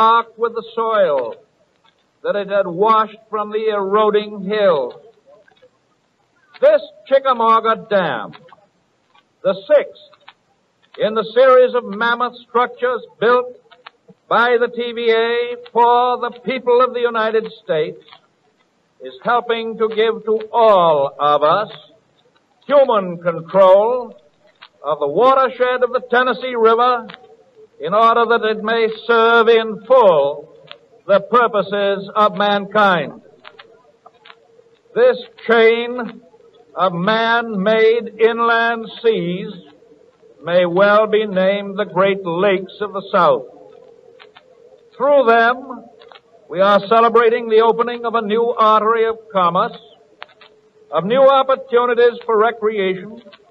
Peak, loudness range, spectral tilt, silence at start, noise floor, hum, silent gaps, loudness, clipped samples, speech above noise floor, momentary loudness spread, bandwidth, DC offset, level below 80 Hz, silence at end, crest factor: -2 dBFS; 4 LU; -7 dB/octave; 0 s; -61 dBFS; none; none; -15 LUFS; under 0.1%; 46 dB; 11 LU; 6 kHz; under 0.1%; -68 dBFS; 0.3 s; 16 dB